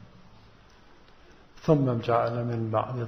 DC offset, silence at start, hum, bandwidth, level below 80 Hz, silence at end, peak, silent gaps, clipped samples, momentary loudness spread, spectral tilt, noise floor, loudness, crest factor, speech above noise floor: under 0.1%; 0 s; none; 6.4 kHz; -58 dBFS; 0 s; -8 dBFS; none; under 0.1%; 6 LU; -9 dB/octave; -54 dBFS; -27 LUFS; 20 dB; 28 dB